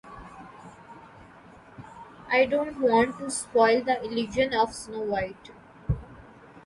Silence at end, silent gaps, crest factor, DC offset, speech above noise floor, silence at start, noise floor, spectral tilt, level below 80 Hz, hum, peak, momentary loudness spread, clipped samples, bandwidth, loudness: 0.05 s; none; 18 dB; under 0.1%; 25 dB; 0.05 s; -50 dBFS; -4.5 dB/octave; -48 dBFS; none; -8 dBFS; 25 LU; under 0.1%; 11.5 kHz; -26 LUFS